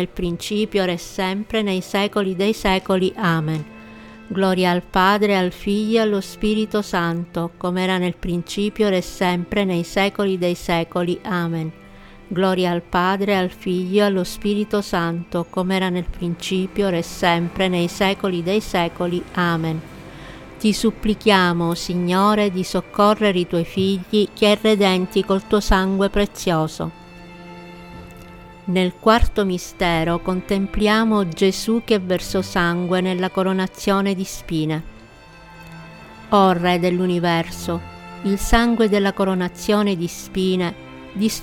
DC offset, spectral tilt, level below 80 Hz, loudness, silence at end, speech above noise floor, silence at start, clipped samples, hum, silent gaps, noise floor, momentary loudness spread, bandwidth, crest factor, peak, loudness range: under 0.1%; -5.5 dB/octave; -36 dBFS; -20 LUFS; 0 s; 24 dB; 0 s; under 0.1%; none; none; -43 dBFS; 11 LU; 17 kHz; 20 dB; 0 dBFS; 4 LU